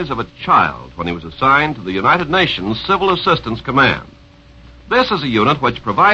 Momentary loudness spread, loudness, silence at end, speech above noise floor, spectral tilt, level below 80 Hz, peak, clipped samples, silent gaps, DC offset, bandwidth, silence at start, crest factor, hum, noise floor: 10 LU; -15 LUFS; 0 s; 28 dB; -6 dB/octave; -40 dBFS; 0 dBFS; under 0.1%; none; under 0.1%; 8 kHz; 0 s; 16 dB; none; -43 dBFS